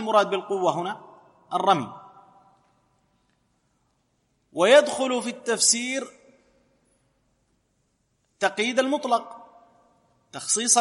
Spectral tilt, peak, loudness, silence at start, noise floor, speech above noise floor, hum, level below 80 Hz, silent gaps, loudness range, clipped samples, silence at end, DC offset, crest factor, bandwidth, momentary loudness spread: -2 dB/octave; -4 dBFS; -23 LUFS; 0 s; -71 dBFS; 48 dB; none; -78 dBFS; none; 8 LU; under 0.1%; 0 s; under 0.1%; 22 dB; 12 kHz; 20 LU